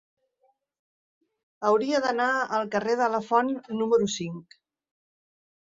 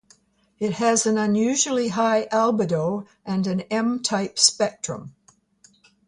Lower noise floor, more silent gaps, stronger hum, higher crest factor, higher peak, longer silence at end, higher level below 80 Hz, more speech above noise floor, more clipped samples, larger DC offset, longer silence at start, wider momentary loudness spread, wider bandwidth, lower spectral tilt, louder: first, -70 dBFS vs -59 dBFS; neither; neither; about the same, 20 dB vs 20 dB; second, -8 dBFS vs -4 dBFS; first, 1.3 s vs 0.95 s; second, -70 dBFS vs -64 dBFS; first, 45 dB vs 37 dB; neither; neither; first, 1.6 s vs 0.6 s; second, 6 LU vs 11 LU; second, 7.8 kHz vs 11.5 kHz; about the same, -4.5 dB/octave vs -3.5 dB/octave; second, -25 LUFS vs -22 LUFS